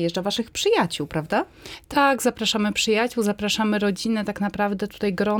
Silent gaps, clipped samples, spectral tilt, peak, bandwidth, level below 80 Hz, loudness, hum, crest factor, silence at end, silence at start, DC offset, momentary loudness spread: none; under 0.1%; -4 dB/octave; -8 dBFS; 19 kHz; -52 dBFS; -23 LUFS; none; 16 dB; 0 s; 0 s; under 0.1%; 6 LU